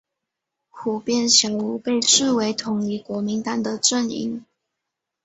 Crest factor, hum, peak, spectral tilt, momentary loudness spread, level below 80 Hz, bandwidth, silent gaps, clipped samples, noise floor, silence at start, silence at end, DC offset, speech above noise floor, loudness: 22 dB; none; -2 dBFS; -2.5 dB/octave; 12 LU; -66 dBFS; 8.2 kHz; none; under 0.1%; -82 dBFS; 0.75 s; 0.85 s; under 0.1%; 61 dB; -20 LUFS